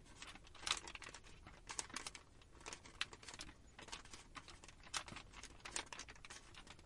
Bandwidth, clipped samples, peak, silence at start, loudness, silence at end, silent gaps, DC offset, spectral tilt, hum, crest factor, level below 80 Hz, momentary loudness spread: 11.5 kHz; under 0.1%; -20 dBFS; 0 s; -50 LUFS; 0 s; none; under 0.1%; -1 dB/octave; none; 32 dB; -66 dBFS; 15 LU